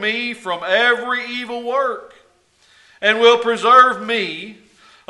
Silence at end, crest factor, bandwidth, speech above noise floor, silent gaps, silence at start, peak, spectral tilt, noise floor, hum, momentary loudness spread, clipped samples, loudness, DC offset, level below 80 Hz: 0.55 s; 18 dB; 11.5 kHz; 39 dB; none; 0 s; 0 dBFS; -3 dB/octave; -56 dBFS; none; 14 LU; under 0.1%; -16 LUFS; under 0.1%; -68 dBFS